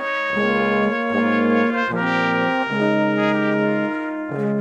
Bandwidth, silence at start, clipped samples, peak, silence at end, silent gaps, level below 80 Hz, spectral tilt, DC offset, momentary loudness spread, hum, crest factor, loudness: 8.2 kHz; 0 s; under 0.1%; -6 dBFS; 0 s; none; -56 dBFS; -7 dB/octave; under 0.1%; 5 LU; none; 14 dB; -20 LUFS